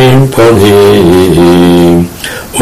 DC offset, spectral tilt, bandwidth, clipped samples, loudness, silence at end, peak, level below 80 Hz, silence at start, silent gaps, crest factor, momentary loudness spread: under 0.1%; -6 dB/octave; 16 kHz; 7%; -5 LUFS; 0 s; 0 dBFS; -28 dBFS; 0 s; none; 4 dB; 10 LU